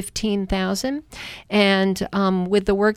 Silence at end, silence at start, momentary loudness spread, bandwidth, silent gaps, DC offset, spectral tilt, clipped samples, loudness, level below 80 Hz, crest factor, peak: 0 s; 0 s; 11 LU; 14.5 kHz; none; under 0.1%; -5 dB/octave; under 0.1%; -21 LUFS; -40 dBFS; 14 dB; -6 dBFS